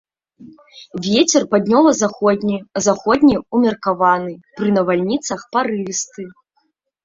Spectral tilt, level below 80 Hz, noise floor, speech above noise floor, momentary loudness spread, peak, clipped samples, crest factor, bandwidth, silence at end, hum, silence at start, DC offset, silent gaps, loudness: -4.5 dB/octave; -54 dBFS; -67 dBFS; 50 dB; 11 LU; -2 dBFS; under 0.1%; 16 dB; 7.8 kHz; 0.75 s; none; 0.4 s; under 0.1%; none; -17 LUFS